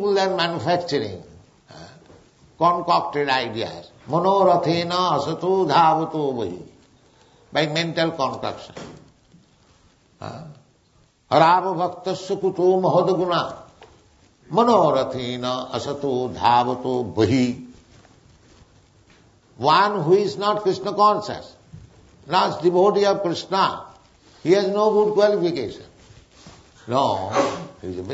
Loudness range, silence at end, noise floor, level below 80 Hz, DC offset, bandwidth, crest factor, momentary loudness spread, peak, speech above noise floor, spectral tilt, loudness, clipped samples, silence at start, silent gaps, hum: 6 LU; 0 s; -59 dBFS; -60 dBFS; under 0.1%; 8 kHz; 20 dB; 16 LU; -2 dBFS; 39 dB; -5.5 dB/octave; -20 LUFS; under 0.1%; 0 s; none; none